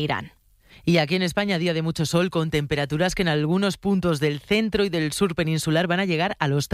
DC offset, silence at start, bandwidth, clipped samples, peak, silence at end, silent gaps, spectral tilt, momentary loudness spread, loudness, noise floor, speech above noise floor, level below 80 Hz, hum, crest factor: under 0.1%; 0 s; 15.5 kHz; under 0.1%; -6 dBFS; 0.1 s; none; -5.5 dB/octave; 3 LU; -23 LUFS; -53 dBFS; 30 dB; -48 dBFS; none; 16 dB